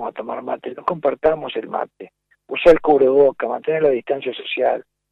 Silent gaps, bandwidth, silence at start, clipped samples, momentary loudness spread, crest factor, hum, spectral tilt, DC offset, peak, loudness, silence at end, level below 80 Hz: none; 7 kHz; 0 s; under 0.1%; 13 LU; 18 dB; none; -6.5 dB/octave; under 0.1%; -2 dBFS; -19 LUFS; 0.3 s; -50 dBFS